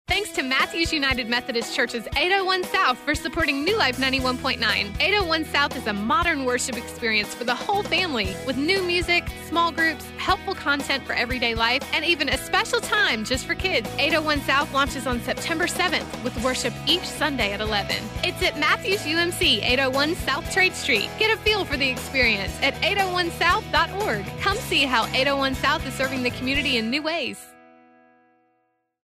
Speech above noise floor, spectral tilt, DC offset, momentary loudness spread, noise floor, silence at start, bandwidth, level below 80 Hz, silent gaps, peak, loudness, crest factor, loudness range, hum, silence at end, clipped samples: 47 dB; -3 dB/octave; under 0.1%; 5 LU; -70 dBFS; 0.1 s; 16 kHz; -42 dBFS; none; -8 dBFS; -22 LUFS; 16 dB; 2 LU; none; 1.55 s; under 0.1%